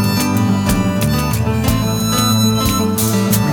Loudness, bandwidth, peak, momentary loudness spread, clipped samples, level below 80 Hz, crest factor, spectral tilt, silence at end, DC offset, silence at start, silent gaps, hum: -15 LUFS; over 20 kHz; -2 dBFS; 3 LU; under 0.1%; -30 dBFS; 12 dB; -5 dB/octave; 0 s; under 0.1%; 0 s; none; none